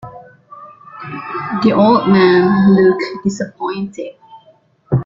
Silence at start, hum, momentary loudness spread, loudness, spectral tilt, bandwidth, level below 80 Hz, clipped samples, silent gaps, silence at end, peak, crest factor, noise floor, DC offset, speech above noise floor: 0.05 s; none; 18 LU; -13 LUFS; -7.5 dB/octave; 7.6 kHz; -50 dBFS; under 0.1%; none; 0 s; -2 dBFS; 14 dB; -51 dBFS; under 0.1%; 37 dB